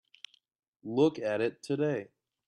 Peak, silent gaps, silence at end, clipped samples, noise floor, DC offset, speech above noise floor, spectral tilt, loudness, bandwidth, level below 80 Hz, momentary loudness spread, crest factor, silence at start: -14 dBFS; none; 0.4 s; under 0.1%; -55 dBFS; under 0.1%; 26 dB; -6.5 dB/octave; -31 LUFS; 10.5 kHz; -76 dBFS; 23 LU; 18 dB; 0.85 s